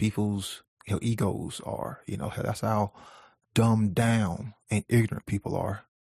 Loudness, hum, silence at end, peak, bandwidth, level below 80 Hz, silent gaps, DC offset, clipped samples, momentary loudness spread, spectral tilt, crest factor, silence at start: -29 LUFS; none; 0.3 s; -10 dBFS; 14 kHz; -56 dBFS; 0.68-0.77 s; under 0.1%; under 0.1%; 11 LU; -6.5 dB/octave; 18 dB; 0 s